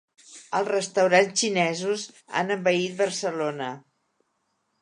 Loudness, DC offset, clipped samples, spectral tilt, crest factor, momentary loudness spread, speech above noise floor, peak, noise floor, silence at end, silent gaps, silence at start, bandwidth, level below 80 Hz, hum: -25 LUFS; under 0.1%; under 0.1%; -3.5 dB/octave; 20 dB; 11 LU; 50 dB; -6 dBFS; -74 dBFS; 1 s; none; 0.3 s; 11.5 kHz; -78 dBFS; none